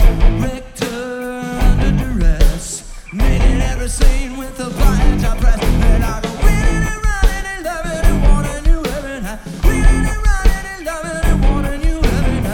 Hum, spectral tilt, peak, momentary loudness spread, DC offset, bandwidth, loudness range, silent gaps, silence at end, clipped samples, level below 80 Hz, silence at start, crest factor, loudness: none; -5.5 dB/octave; 0 dBFS; 9 LU; under 0.1%; 15.5 kHz; 1 LU; none; 0 s; under 0.1%; -14 dBFS; 0 s; 14 dB; -18 LUFS